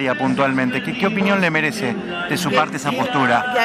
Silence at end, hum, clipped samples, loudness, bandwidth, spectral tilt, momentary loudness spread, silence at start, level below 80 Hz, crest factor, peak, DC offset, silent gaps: 0 s; none; under 0.1%; -19 LUFS; 15.5 kHz; -5 dB/octave; 6 LU; 0 s; -56 dBFS; 18 dB; -2 dBFS; under 0.1%; none